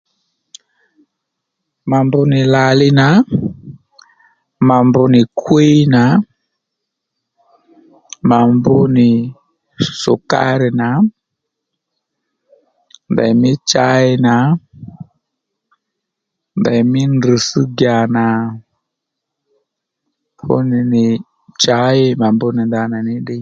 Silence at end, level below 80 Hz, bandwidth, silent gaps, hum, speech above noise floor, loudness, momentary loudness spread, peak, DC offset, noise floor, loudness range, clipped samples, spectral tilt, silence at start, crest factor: 0 s; -50 dBFS; 7.6 kHz; none; none; 66 dB; -13 LUFS; 10 LU; 0 dBFS; under 0.1%; -78 dBFS; 5 LU; under 0.1%; -6 dB/octave; 1.85 s; 14 dB